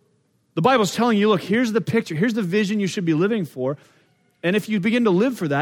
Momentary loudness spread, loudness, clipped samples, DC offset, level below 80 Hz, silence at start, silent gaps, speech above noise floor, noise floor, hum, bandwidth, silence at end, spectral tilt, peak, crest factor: 9 LU; -21 LUFS; under 0.1%; under 0.1%; -68 dBFS; 0.55 s; none; 44 dB; -64 dBFS; none; 17 kHz; 0 s; -6 dB/octave; -2 dBFS; 18 dB